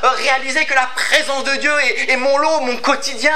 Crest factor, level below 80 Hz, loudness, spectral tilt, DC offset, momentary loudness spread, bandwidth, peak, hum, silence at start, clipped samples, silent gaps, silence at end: 16 dB; -68 dBFS; -15 LUFS; -0.5 dB/octave; 5%; 3 LU; 16 kHz; 0 dBFS; none; 0 s; under 0.1%; none; 0 s